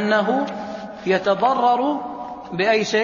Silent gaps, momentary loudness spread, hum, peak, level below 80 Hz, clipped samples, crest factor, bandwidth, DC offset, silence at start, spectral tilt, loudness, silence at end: none; 13 LU; none; -6 dBFS; -60 dBFS; under 0.1%; 14 dB; 7.4 kHz; under 0.1%; 0 s; -5 dB/octave; -20 LUFS; 0 s